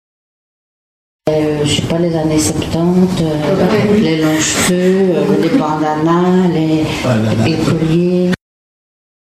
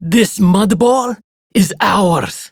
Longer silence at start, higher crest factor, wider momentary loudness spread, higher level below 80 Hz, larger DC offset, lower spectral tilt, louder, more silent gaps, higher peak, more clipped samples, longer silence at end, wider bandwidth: first, 1.25 s vs 0 s; about the same, 12 dB vs 12 dB; second, 4 LU vs 7 LU; about the same, -40 dBFS vs -44 dBFS; neither; about the same, -5.5 dB/octave vs -5.5 dB/octave; about the same, -13 LUFS vs -13 LUFS; second, none vs 1.24-1.50 s; about the same, 0 dBFS vs 0 dBFS; neither; first, 0.95 s vs 0.05 s; second, 15 kHz vs 19.5 kHz